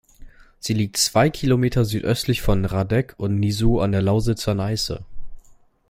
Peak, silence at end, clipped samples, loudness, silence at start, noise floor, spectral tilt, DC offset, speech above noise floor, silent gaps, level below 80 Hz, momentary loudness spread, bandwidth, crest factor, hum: -2 dBFS; 0.5 s; under 0.1%; -21 LUFS; 0.2 s; -49 dBFS; -5.5 dB/octave; under 0.1%; 29 dB; none; -34 dBFS; 6 LU; 16.5 kHz; 18 dB; none